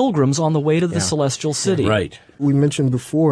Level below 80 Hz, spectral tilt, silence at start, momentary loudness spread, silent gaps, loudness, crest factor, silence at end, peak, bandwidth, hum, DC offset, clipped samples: -50 dBFS; -5.5 dB/octave; 0 s; 4 LU; none; -18 LUFS; 14 dB; 0 s; -4 dBFS; 11 kHz; none; under 0.1%; under 0.1%